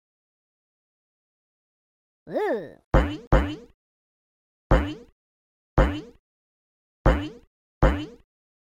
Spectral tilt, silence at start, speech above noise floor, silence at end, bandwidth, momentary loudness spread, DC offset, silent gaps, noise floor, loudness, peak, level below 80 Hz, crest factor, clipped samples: -7.5 dB/octave; 2.25 s; over 66 dB; 0.65 s; 7.6 kHz; 13 LU; under 0.1%; 2.85-2.91 s, 3.27-3.31 s, 3.74-4.70 s, 5.12-5.76 s, 6.19-7.04 s, 7.47-7.81 s; under -90 dBFS; -26 LUFS; -4 dBFS; -30 dBFS; 22 dB; under 0.1%